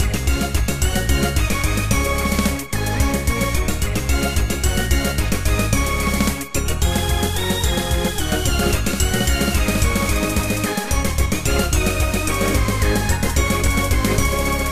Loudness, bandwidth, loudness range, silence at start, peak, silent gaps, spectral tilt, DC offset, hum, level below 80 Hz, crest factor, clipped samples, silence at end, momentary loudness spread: -20 LUFS; 16 kHz; 1 LU; 0 s; -2 dBFS; none; -4 dB/octave; 2%; none; -22 dBFS; 16 dB; under 0.1%; 0 s; 2 LU